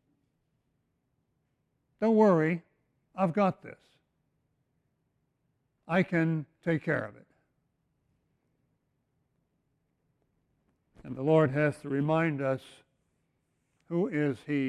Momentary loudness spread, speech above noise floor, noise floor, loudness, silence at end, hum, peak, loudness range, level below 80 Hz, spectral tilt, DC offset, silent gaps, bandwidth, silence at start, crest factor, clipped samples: 12 LU; 49 dB; -77 dBFS; -29 LUFS; 0 s; none; -12 dBFS; 6 LU; -70 dBFS; -8.5 dB/octave; under 0.1%; none; 11 kHz; 2 s; 22 dB; under 0.1%